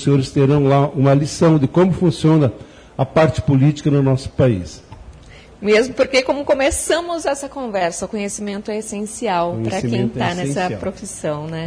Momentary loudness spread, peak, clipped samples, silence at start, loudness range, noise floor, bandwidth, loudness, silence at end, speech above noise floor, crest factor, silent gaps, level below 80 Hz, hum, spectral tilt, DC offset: 10 LU; -2 dBFS; under 0.1%; 0 s; 6 LU; -41 dBFS; 11 kHz; -18 LUFS; 0 s; 24 dB; 14 dB; none; -42 dBFS; none; -6 dB/octave; under 0.1%